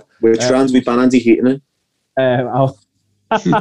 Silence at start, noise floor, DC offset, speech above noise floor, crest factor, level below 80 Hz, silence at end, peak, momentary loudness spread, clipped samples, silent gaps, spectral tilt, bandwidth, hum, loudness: 0.2 s; -56 dBFS; under 0.1%; 43 dB; 14 dB; -56 dBFS; 0 s; 0 dBFS; 7 LU; under 0.1%; none; -6 dB/octave; 10 kHz; none; -15 LUFS